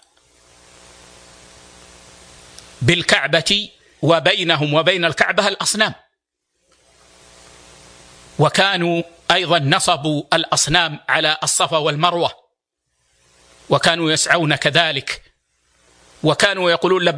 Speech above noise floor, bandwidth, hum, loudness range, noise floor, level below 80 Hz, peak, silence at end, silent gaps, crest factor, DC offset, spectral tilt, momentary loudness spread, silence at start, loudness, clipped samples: 57 dB; 10.5 kHz; none; 6 LU; -74 dBFS; -50 dBFS; 0 dBFS; 0 s; none; 20 dB; under 0.1%; -3 dB/octave; 6 LU; 2.8 s; -16 LUFS; under 0.1%